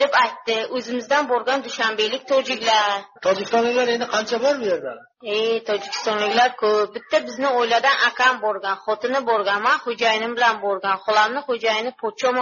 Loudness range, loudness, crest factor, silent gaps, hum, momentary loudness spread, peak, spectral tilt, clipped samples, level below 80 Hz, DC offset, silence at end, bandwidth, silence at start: 2 LU; -20 LUFS; 16 dB; none; none; 6 LU; -4 dBFS; 0.5 dB/octave; under 0.1%; -74 dBFS; under 0.1%; 0 s; 7.2 kHz; 0 s